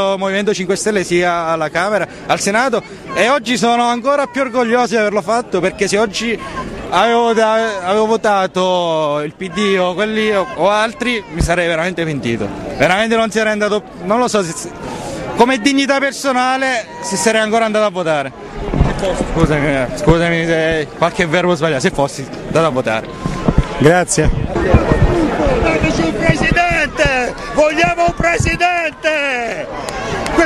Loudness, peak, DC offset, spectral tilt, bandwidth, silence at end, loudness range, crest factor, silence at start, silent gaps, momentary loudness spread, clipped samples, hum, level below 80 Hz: -15 LUFS; 0 dBFS; under 0.1%; -4.5 dB/octave; 14 kHz; 0 s; 2 LU; 14 dB; 0 s; none; 7 LU; under 0.1%; none; -28 dBFS